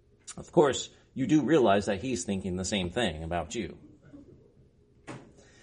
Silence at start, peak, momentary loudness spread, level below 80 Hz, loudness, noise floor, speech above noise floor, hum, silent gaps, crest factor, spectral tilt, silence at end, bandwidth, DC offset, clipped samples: 0.25 s; -8 dBFS; 22 LU; -54 dBFS; -28 LUFS; -61 dBFS; 33 dB; none; none; 22 dB; -5 dB/octave; 0.4 s; 10.5 kHz; under 0.1%; under 0.1%